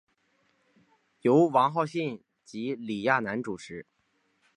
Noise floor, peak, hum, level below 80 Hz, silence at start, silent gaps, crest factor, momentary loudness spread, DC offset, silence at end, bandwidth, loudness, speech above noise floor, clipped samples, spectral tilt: -72 dBFS; -8 dBFS; none; -74 dBFS; 1.25 s; none; 22 dB; 21 LU; under 0.1%; 0.75 s; 11 kHz; -27 LUFS; 46 dB; under 0.1%; -6.5 dB/octave